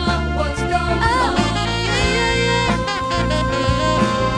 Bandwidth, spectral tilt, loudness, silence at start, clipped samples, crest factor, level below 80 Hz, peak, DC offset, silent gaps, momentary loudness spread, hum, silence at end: 11 kHz; -5 dB/octave; -18 LUFS; 0 s; under 0.1%; 14 dB; -26 dBFS; -4 dBFS; under 0.1%; none; 4 LU; none; 0 s